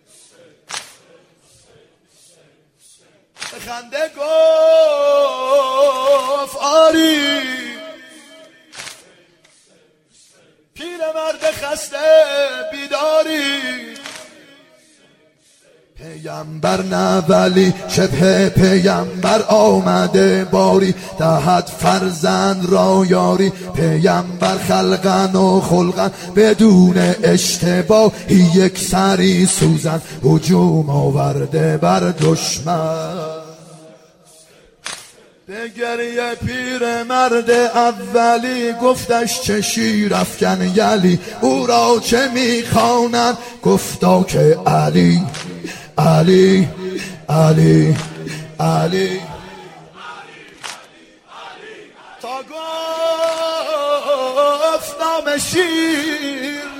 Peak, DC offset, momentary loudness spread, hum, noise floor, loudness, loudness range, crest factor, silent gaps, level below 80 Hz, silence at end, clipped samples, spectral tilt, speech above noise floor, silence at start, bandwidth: 0 dBFS; under 0.1%; 17 LU; none; -54 dBFS; -15 LUFS; 12 LU; 16 dB; none; -46 dBFS; 0 s; under 0.1%; -5.5 dB/octave; 40 dB; 0.7 s; 16.5 kHz